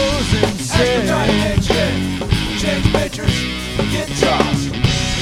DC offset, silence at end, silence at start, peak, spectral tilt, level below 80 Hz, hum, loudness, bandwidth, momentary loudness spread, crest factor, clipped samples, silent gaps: under 0.1%; 0 s; 0 s; 0 dBFS; -4.5 dB/octave; -28 dBFS; none; -17 LUFS; 16.5 kHz; 4 LU; 16 dB; under 0.1%; none